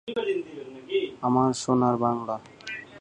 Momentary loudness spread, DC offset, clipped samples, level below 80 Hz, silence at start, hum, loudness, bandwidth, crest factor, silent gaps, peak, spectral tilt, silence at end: 14 LU; under 0.1%; under 0.1%; -64 dBFS; 0.05 s; none; -26 LUFS; 10 kHz; 18 dB; none; -10 dBFS; -6 dB/octave; 0 s